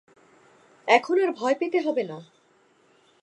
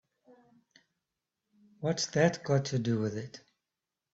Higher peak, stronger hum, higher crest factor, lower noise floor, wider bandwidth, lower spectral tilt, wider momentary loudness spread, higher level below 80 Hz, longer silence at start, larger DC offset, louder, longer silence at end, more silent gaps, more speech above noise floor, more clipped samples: first, -2 dBFS vs -12 dBFS; neither; about the same, 24 dB vs 22 dB; second, -62 dBFS vs -89 dBFS; first, 11 kHz vs 8 kHz; about the same, -4.5 dB/octave vs -5.5 dB/octave; about the same, 16 LU vs 15 LU; second, -84 dBFS vs -70 dBFS; second, 0.85 s vs 1.8 s; neither; first, -24 LUFS vs -31 LUFS; first, 1 s vs 0.75 s; neither; second, 39 dB vs 59 dB; neither